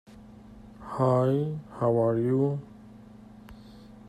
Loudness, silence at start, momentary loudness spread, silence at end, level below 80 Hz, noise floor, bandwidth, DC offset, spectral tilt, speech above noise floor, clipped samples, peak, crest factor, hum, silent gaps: -27 LUFS; 0.1 s; 25 LU; 0 s; -58 dBFS; -49 dBFS; 11 kHz; under 0.1%; -10 dB/octave; 23 dB; under 0.1%; -12 dBFS; 16 dB; none; none